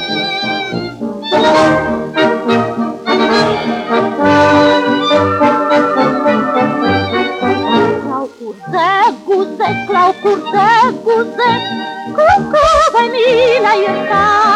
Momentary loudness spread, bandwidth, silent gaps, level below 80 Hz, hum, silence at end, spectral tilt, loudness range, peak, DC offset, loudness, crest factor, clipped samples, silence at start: 9 LU; 11.5 kHz; none; -42 dBFS; none; 0 s; -5 dB/octave; 3 LU; -2 dBFS; under 0.1%; -12 LUFS; 10 dB; under 0.1%; 0 s